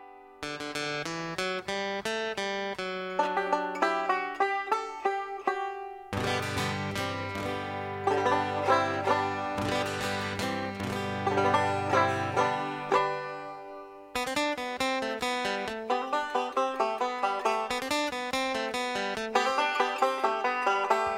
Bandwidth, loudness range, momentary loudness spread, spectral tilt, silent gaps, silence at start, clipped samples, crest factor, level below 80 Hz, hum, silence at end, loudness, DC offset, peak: 16.5 kHz; 3 LU; 7 LU; -4 dB/octave; none; 0 s; under 0.1%; 20 dB; -62 dBFS; none; 0 s; -30 LUFS; under 0.1%; -10 dBFS